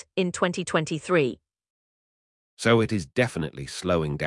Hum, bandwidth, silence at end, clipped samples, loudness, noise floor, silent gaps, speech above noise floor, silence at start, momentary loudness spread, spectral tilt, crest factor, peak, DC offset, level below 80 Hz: none; 12 kHz; 0 s; under 0.1%; -25 LUFS; under -90 dBFS; 1.70-2.57 s; over 65 dB; 0.15 s; 10 LU; -5.5 dB/octave; 20 dB; -6 dBFS; under 0.1%; -54 dBFS